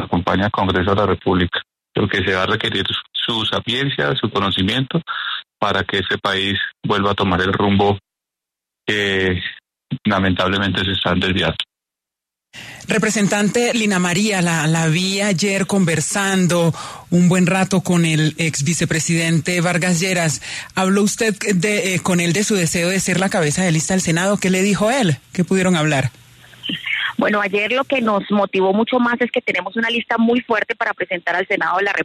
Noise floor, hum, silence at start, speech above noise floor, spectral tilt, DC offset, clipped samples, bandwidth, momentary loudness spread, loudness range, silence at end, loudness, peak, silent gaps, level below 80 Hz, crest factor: -85 dBFS; none; 0 s; 68 dB; -4.5 dB/octave; under 0.1%; under 0.1%; 13.5 kHz; 5 LU; 3 LU; 0 s; -18 LUFS; -2 dBFS; none; -48 dBFS; 16 dB